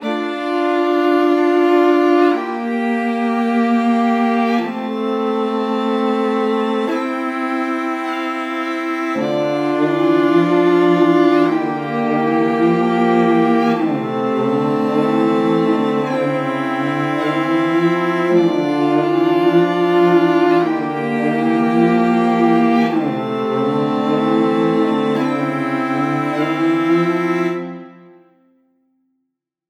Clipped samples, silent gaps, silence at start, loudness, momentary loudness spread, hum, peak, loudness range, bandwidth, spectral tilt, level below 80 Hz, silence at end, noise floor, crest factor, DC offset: under 0.1%; none; 0 s; -16 LUFS; 7 LU; none; -2 dBFS; 4 LU; 10 kHz; -7 dB/octave; -78 dBFS; 1.75 s; -75 dBFS; 14 dB; under 0.1%